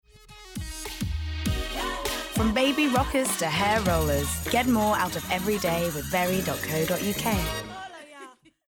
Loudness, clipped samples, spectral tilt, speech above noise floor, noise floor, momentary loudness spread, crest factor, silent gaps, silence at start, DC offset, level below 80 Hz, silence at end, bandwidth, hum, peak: -26 LUFS; under 0.1%; -4 dB/octave; 23 dB; -48 dBFS; 14 LU; 16 dB; none; 0.15 s; under 0.1%; -40 dBFS; 0.35 s; 19.5 kHz; none; -10 dBFS